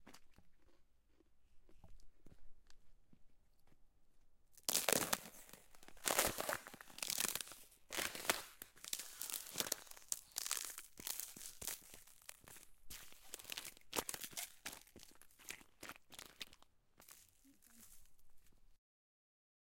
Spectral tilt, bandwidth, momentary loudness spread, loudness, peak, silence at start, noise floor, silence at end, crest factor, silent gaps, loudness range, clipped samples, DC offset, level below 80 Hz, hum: -0.5 dB/octave; 17 kHz; 23 LU; -43 LUFS; -12 dBFS; 0 s; -71 dBFS; 1 s; 36 dB; none; 17 LU; under 0.1%; under 0.1%; -70 dBFS; none